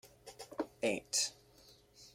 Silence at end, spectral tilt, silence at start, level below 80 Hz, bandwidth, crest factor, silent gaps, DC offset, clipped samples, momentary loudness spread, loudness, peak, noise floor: 0.05 s; -1.5 dB/octave; 0.05 s; -74 dBFS; 16.5 kHz; 22 dB; none; under 0.1%; under 0.1%; 21 LU; -37 LUFS; -20 dBFS; -64 dBFS